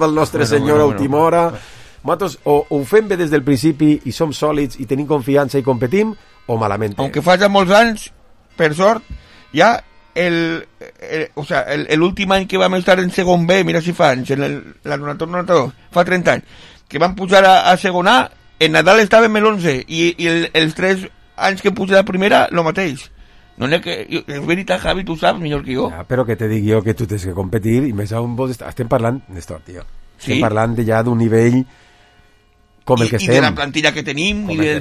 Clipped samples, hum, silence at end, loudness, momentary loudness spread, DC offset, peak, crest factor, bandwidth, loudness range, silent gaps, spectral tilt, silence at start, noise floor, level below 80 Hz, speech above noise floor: under 0.1%; none; 0 s; -15 LUFS; 11 LU; under 0.1%; 0 dBFS; 16 dB; 15 kHz; 6 LU; none; -5.5 dB/octave; 0 s; -52 dBFS; -42 dBFS; 37 dB